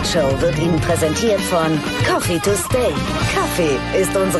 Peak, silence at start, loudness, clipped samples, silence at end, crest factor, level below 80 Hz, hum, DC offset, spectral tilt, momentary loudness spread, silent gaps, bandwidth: -4 dBFS; 0 s; -17 LUFS; under 0.1%; 0 s; 12 dB; -32 dBFS; none; under 0.1%; -4.5 dB/octave; 2 LU; none; 12.5 kHz